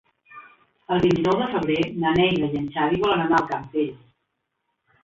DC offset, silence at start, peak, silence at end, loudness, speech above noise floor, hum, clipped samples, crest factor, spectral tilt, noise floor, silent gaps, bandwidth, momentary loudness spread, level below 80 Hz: under 0.1%; 0.3 s; -8 dBFS; 1.1 s; -22 LUFS; 55 dB; none; under 0.1%; 16 dB; -7 dB/octave; -77 dBFS; none; 7.6 kHz; 7 LU; -52 dBFS